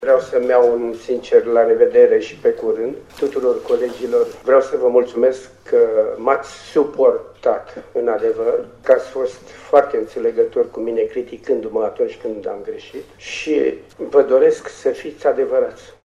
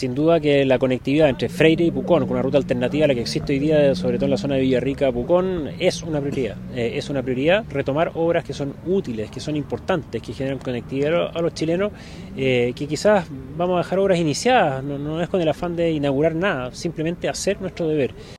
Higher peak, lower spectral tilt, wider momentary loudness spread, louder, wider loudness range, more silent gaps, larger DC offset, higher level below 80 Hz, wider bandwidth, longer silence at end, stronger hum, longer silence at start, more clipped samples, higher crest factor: about the same, 0 dBFS vs 0 dBFS; about the same, -5 dB/octave vs -6 dB/octave; first, 12 LU vs 9 LU; first, -18 LUFS vs -21 LUFS; about the same, 5 LU vs 5 LU; neither; neither; second, -56 dBFS vs -44 dBFS; second, 9 kHz vs 13 kHz; first, 0.25 s vs 0 s; neither; about the same, 0 s vs 0 s; neither; about the same, 18 dB vs 20 dB